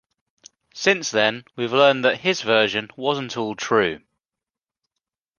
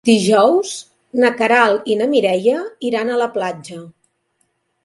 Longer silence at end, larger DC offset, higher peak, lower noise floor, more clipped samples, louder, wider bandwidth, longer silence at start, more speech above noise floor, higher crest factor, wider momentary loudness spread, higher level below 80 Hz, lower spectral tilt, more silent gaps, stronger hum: first, 1.4 s vs 0.95 s; neither; about the same, -2 dBFS vs 0 dBFS; first, -89 dBFS vs -66 dBFS; neither; second, -20 LUFS vs -16 LUFS; second, 10 kHz vs 11.5 kHz; first, 0.75 s vs 0.05 s; first, 68 dB vs 51 dB; about the same, 20 dB vs 16 dB; second, 9 LU vs 15 LU; about the same, -64 dBFS vs -66 dBFS; about the same, -3.5 dB/octave vs -4.5 dB/octave; neither; neither